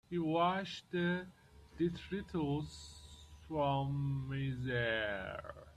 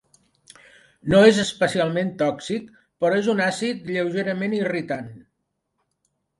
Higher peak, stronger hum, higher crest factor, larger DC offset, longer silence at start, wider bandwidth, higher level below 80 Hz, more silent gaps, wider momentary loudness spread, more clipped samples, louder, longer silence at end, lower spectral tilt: second, -22 dBFS vs -2 dBFS; neither; about the same, 16 dB vs 20 dB; neither; second, 0.1 s vs 1.05 s; about the same, 11 kHz vs 11.5 kHz; about the same, -60 dBFS vs -58 dBFS; neither; about the same, 17 LU vs 15 LU; neither; second, -38 LUFS vs -22 LUFS; second, 0.05 s vs 1.2 s; first, -6.5 dB/octave vs -5 dB/octave